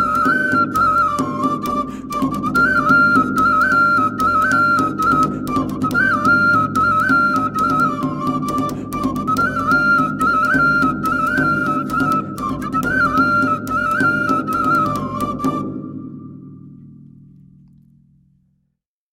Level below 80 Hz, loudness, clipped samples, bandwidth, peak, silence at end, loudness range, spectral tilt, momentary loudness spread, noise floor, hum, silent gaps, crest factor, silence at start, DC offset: -42 dBFS; -16 LUFS; under 0.1%; 16.5 kHz; -2 dBFS; 2.2 s; 7 LU; -6 dB/octave; 9 LU; -72 dBFS; none; none; 16 dB; 0 s; under 0.1%